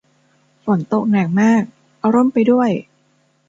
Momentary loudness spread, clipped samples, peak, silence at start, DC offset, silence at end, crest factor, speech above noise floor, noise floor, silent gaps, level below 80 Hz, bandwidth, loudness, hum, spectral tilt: 10 LU; under 0.1%; -2 dBFS; 0.65 s; under 0.1%; 0.65 s; 16 dB; 45 dB; -60 dBFS; none; -62 dBFS; 7.8 kHz; -16 LUFS; none; -8 dB/octave